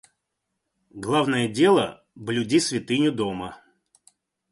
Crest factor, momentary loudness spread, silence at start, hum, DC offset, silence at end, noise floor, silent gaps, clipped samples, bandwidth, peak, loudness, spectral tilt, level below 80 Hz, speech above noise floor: 18 dB; 16 LU; 0.95 s; none; under 0.1%; 0.95 s; -80 dBFS; none; under 0.1%; 11.5 kHz; -6 dBFS; -23 LUFS; -4.5 dB/octave; -60 dBFS; 57 dB